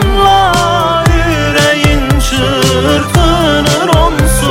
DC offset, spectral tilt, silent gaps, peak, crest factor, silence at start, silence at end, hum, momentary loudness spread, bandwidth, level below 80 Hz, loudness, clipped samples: under 0.1%; -4.5 dB/octave; none; 0 dBFS; 8 dB; 0 s; 0 s; none; 3 LU; 17 kHz; -16 dBFS; -9 LUFS; under 0.1%